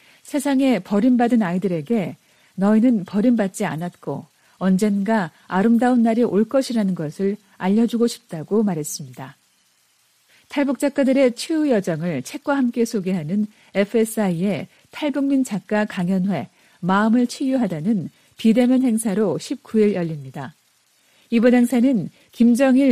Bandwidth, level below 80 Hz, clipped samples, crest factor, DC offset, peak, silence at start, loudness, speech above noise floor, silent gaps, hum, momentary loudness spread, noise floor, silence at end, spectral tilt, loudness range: 15 kHz; -64 dBFS; under 0.1%; 16 dB; under 0.1%; -4 dBFS; 0.25 s; -20 LUFS; 42 dB; none; none; 12 LU; -61 dBFS; 0 s; -6.5 dB/octave; 3 LU